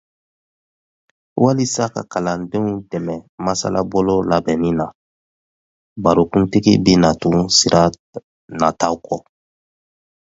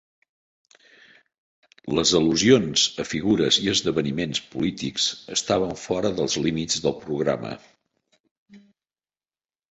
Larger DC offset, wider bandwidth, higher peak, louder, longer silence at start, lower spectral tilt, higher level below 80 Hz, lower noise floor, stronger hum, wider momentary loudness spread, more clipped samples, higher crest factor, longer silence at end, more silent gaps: neither; about the same, 8 kHz vs 8.4 kHz; first, 0 dBFS vs -4 dBFS; first, -17 LUFS vs -22 LUFS; second, 1.35 s vs 1.85 s; first, -5 dB/octave vs -3.5 dB/octave; first, -44 dBFS vs -54 dBFS; about the same, under -90 dBFS vs under -90 dBFS; neither; first, 14 LU vs 9 LU; neither; about the same, 18 dB vs 22 dB; about the same, 1.05 s vs 1.1 s; first, 3.29-3.38 s, 4.95-5.96 s, 7.99-8.13 s, 8.24-8.48 s vs 8.20-8.24 s, 8.31-8.46 s